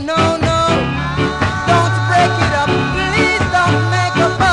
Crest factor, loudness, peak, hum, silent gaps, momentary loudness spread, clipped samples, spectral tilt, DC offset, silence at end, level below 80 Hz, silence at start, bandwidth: 12 dB; -14 LUFS; -2 dBFS; none; none; 3 LU; under 0.1%; -5.5 dB/octave; under 0.1%; 0 s; -30 dBFS; 0 s; 10.5 kHz